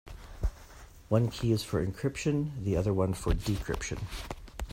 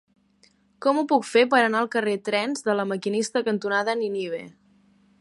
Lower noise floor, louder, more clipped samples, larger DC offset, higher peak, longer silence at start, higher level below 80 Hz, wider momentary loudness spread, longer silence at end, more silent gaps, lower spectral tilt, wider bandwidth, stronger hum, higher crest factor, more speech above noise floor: second, -51 dBFS vs -61 dBFS; second, -32 LUFS vs -23 LUFS; neither; neither; second, -12 dBFS vs -6 dBFS; second, 0.05 s vs 0.8 s; first, -40 dBFS vs -76 dBFS; first, 13 LU vs 8 LU; second, 0 s vs 0.7 s; neither; first, -6.5 dB/octave vs -4 dB/octave; first, 16 kHz vs 11.5 kHz; neither; about the same, 18 dB vs 20 dB; second, 21 dB vs 38 dB